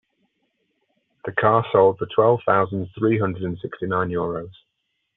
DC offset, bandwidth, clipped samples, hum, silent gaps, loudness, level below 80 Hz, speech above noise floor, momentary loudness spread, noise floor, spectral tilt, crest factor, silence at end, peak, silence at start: under 0.1%; 4 kHz; under 0.1%; none; none; -21 LUFS; -60 dBFS; 54 dB; 12 LU; -75 dBFS; -6 dB/octave; 20 dB; 0.65 s; -4 dBFS; 1.25 s